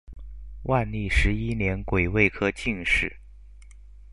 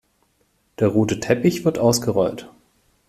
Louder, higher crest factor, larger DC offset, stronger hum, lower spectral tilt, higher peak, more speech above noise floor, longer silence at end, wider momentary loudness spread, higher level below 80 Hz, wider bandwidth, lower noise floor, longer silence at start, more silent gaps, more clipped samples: second, -25 LUFS vs -20 LUFS; about the same, 20 dB vs 18 dB; first, 0.5% vs under 0.1%; first, 50 Hz at -40 dBFS vs none; about the same, -6 dB/octave vs -5.5 dB/octave; about the same, -6 dBFS vs -4 dBFS; second, 22 dB vs 46 dB; second, 0.05 s vs 0.6 s; first, 16 LU vs 5 LU; first, -34 dBFS vs -52 dBFS; second, 11.5 kHz vs 15.5 kHz; second, -47 dBFS vs -65 dBFS; second, 0.05 s vs 0.8 s; neither; neither